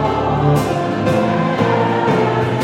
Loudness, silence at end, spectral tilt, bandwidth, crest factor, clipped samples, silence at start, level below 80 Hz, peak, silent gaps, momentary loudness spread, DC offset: -16 LUFS; 0 s; -7 dB/octave; 16 kHz; 16 dB; under 0.1%; 0 s; -38 dBFS; 0 dBFS; none; 2 LU; under 0.1%